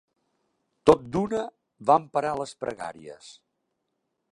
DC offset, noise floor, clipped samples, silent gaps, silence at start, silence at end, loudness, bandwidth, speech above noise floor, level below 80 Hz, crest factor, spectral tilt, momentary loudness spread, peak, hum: under 0.1%; -79 dBFS; under 0.1%; none; 0.85 s; 1 s; -25 LUFS; 11.5 kHz; 54 dB; -56 dBFS; 26 dB; -6 dB/octave; 20 LU; -2 dBFS; none